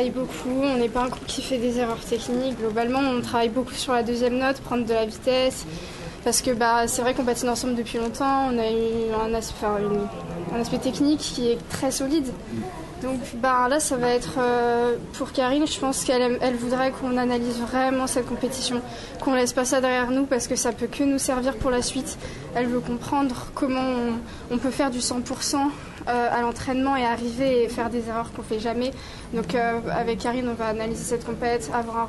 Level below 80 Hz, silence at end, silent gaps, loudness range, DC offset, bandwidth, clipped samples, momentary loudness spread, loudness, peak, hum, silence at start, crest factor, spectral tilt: -44 dBFS; 0 s; none; 3 LU; under 0.1%; 12.5 kHz; under 0.1%; 8 LU; -24 LUFS; -8 dBFS; none; 0 s; 16 dB; -4 dB/octave